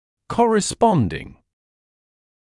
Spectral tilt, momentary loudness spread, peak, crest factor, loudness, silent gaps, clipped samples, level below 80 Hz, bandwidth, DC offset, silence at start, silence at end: -5.5 dB/octave; 10 LU; -4 dBFS; 18 dB; -19 LUFS; none; under 0.1%; -48 dBFS; 12 kHz; under 0.1%; 0.3 s; 1.1 s